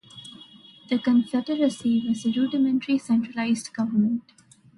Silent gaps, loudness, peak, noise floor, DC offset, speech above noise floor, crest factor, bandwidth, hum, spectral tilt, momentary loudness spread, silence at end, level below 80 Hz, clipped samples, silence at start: none; -24 LUFS; -12 dBFS; -49 dBFS; under 0.1%; 26 dB; 14 dB; 11.5 kHz; none; -5.5 dB/octave; 8 LU; 0.55 s; -68 dBFS; under 0.1%; 0.15 s